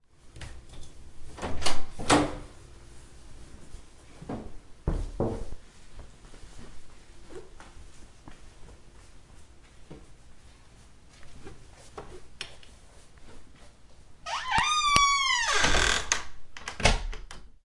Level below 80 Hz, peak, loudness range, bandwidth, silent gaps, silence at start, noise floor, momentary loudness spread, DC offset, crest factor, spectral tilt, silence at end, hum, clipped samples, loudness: -40 dBFS; -2 dBFS; 26 LU; 11.5 kHz; none; 0.25 s; -52 dBFS; 28 LU; under 0.1%; 28 dB; -2.5 dB/octave; 0.2 s; none; under 0.1%; -27 LUFS